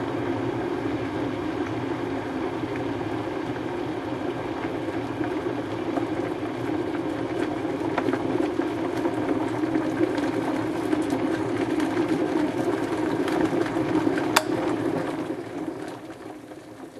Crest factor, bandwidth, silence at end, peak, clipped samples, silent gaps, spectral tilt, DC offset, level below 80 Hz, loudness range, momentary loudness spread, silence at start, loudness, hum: 26 dB; 13.5 kHz; 0 s; 0 dBFS; under 0.1%; none; -6 dB/octave; under 0.1%; -54 dBFS; 5 LU; 6 LU; 0 s; -27 LUFS; none